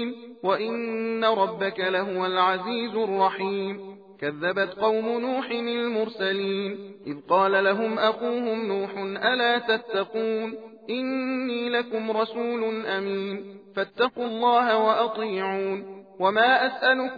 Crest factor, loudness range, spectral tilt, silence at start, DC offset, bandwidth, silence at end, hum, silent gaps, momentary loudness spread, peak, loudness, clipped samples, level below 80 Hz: 18 dB; 4 LU; -7 dB/octave; 0 s; under 0.1%; 5 kHz; 0 s; none; none; 12 LU; -8 dBFS; -25 LUFS; under 0.1%; -78 dBFS